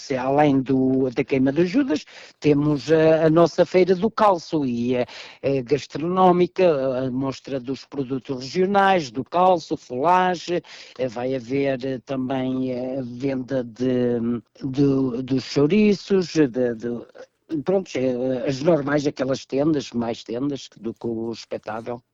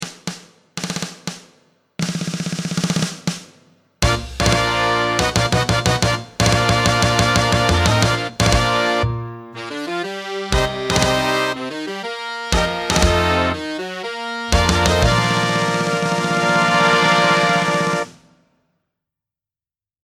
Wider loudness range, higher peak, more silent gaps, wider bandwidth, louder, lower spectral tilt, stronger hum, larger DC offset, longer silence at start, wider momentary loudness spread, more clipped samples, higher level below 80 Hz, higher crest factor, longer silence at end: about the same, 5 LU vs 5 LU; second, -6 dBFS vs 0 dBFS; neither; second, 7.8 kHz vs 19 kHz; second, -22 LUFS vs -18 LUFS; first, -7 dB/octave vs -4 dB/octave; neither; neither; about the same, 0 s vs 0 s; about the same, 12 LU vs 12 LU; neither; second, -56 dBFS vs -30 dBFS; about the same, 16 dB vs 18 dB; second, 0.15 s vs 1.95 s